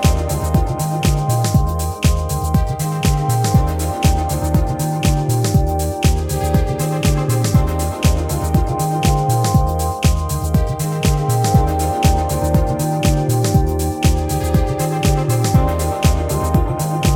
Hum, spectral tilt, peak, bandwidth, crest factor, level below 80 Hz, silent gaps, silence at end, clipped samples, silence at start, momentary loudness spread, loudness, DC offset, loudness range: none; -6 dB/octave; -2 dBFS; 18.5 kHz; 14 dB; -22 dBFS; none; 0 s; under 0.1%; 0 s; 4 LU; -17 LUFS; under 0.1%; 1 LU